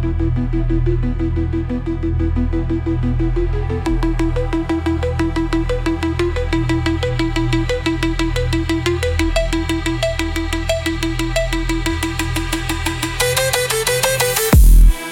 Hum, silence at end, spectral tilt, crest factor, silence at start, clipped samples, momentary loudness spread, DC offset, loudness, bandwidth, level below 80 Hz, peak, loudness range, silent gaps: none; 0 s; -5 dB/octave; 16 dB; 0 s; under 0.1%; 5 LU; under 0.1%; -18 LUFS; 17 kHz; -20 dBFS; 0 dBFS; 2 LU; none